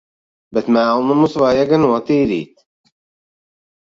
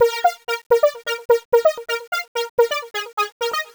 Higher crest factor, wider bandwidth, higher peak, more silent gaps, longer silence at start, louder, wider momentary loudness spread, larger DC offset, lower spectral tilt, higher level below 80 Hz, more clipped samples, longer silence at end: about the same, 16 dB vs 18 dB; second, 7.6 kHz vs over 20 kHz; about the same, -2 dBFS vs -2 dBFS; second, none vs 0.66-0.70 s, 1.25-1.29 s, 1.45-1.52 s, 2.07-2.12 s, 2.28-2.35 s, 2.49-2.57 s, 3.13-3.17 s, 3.32-3.40 s; first, 0.5 s vs 0 s; first, -15 LUFS vs -20 LUFS; about the same, 9 LU vs 9 LU; neither; first, -7.5 dB/octave vs 0 dB/octave; first, -52 dBFS vs -62 dBFS; neither; first, 1.35 s vs 0.1 s